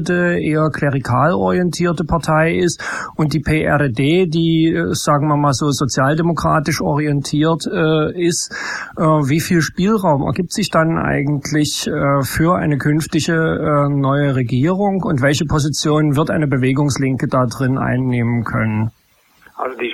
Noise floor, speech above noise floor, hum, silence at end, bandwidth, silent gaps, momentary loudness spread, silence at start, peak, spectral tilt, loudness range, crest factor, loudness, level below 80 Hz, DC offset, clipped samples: -51 dBFS; 35 dB; none; 0 s; 15 kHz; none; 4 LU; 0 s; -2 dBFS; -5.5 dB/octave; 1 LU; 14 dB; -16 LUFS; -40 dBFS; under 0.1%; under 0.1%